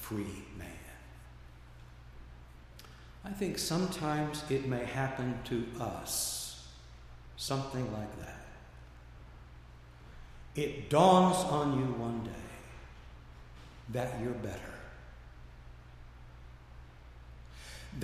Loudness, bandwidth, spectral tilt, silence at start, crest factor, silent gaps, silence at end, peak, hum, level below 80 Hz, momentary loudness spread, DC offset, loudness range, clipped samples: -33 LUFS; 15.5 kHz; -5 dB/octave; 0 s; 26 dB; none; 0 s; -10 dBFS; none; -54 dBFS; 23 LU; under 0.1%; 15 LU; under 0.1%